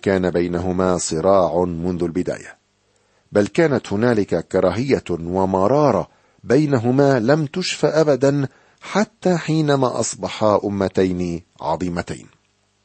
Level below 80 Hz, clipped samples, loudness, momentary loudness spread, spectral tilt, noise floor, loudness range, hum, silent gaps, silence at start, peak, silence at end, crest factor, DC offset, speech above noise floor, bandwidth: -50 dBFS; under 0.1%; -19 LUFS; 9 LU; -6 dB/octave; -62 dBFS; 3 LU; none; none; 0.05 s; -2 dBFS; 0.65 s; 18 dB; under 0.1%; 44 dB; 8.8 kHz